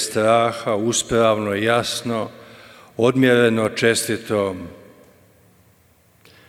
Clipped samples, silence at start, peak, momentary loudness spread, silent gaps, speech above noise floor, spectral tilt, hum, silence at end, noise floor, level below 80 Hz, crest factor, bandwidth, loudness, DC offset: under 0.1%; 0 s; -4 dBFS; 11 LU; none; 37 dB; -4 dB/octave; none; 1.75 s; -56 dBFS; -54 dBFS; 18 dB; 16.5 kHz; -19 LUFS; under 0.1%